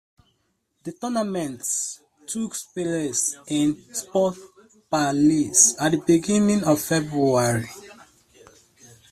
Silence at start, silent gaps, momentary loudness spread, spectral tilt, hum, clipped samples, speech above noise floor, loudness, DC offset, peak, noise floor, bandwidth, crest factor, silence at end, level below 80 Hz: 0.85 s; none; 15 LU; -4 dB/octave; none; under 0.1%; 49 dB; -22 LUFS; under 0.1%; -2 dBFS; -71 dBFS; 15 kHz; 22 dB; 1.2 s; -60 dBFS